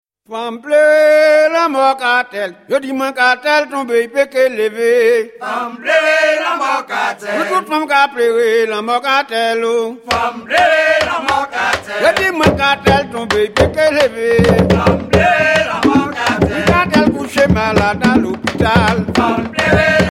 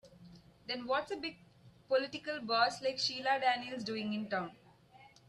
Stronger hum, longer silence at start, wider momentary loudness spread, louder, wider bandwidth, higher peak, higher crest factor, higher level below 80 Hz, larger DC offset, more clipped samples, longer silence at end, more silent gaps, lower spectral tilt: neither; first, 0.3 s vs 0.05 s; second, 7 LU vs 10 LU; first, -13 LUFS vs -35 LUFS; first, 16 kHz vs 11.5 kHz; first, 0 dBFS vs -16 dBFS; second, 14 dB vs 20 dB; first, -34 dBFS vs -74 dBFS; neither; neither; second, 0 s vs 0.2 s; neither; first, -5 dB/octave vs -3.5 dB/octave